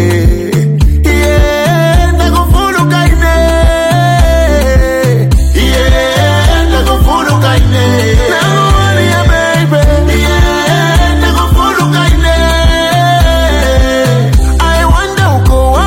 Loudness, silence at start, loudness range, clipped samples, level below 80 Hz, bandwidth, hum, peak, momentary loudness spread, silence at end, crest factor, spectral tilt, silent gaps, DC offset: -9 LUFS; 0 s; 0 LU; under 0.1%; -12 dBFS; 16.5 kHz; none; 0 dBFS; 1 LU; 0 s; 8 dB; -5.5 dB/octave; none; under 0.1%